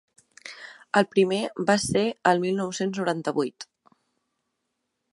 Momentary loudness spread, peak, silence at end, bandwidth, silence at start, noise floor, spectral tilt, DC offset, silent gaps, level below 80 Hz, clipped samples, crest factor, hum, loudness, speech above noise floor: 20 LU; -4 dBFS; 1.5 s; 11.5 kHz; 0.45 s; -79 dBFS; -4.5 dB/octave; under 0.1%; none; -62 dBFS; under 0.1%; 22 dB; none; -25 LUFS; 55 dB